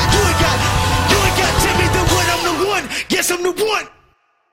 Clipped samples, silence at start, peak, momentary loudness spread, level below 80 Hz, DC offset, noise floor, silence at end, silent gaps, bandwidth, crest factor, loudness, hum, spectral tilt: under 0.1%; 0 s; 0 dBFS; 5 LU; -28 dBFS; under 0.1%; -58 dBFS; 0.65 s; none; 16.5 kHz; 16 dB; -15 LUFS; none; -3.5 dB/octave